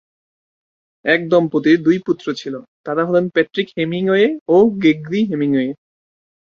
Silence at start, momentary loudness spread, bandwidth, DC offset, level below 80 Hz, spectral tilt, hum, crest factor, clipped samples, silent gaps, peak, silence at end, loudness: 1.05 s; 11 LU; 7 kHz; under 0.1%; -60 dBFS; -7 dB/octave; none; 16 dB; under 0.1%; 2.68-2.84 s, 4.41-4.46 s; 0 dBFS; 0.85 s; -17 LUFS